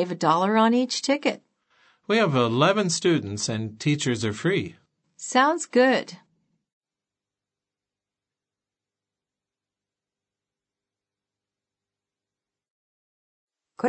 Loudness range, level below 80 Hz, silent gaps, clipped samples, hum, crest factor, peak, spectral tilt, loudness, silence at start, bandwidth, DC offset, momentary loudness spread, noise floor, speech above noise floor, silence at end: 4 LU; -72 dBFS; 6.73-6.81 s, 12.70-13.48 s; under 0.1%; 50 Hz at -55 dBFS; 22 dB; -6 dBFS; -4.5 dB/octave; -23 LUFS; 0 s; 8.8 kHz; under 0.1%; 8 LU; -90 dBFS; 68 dB; 0 s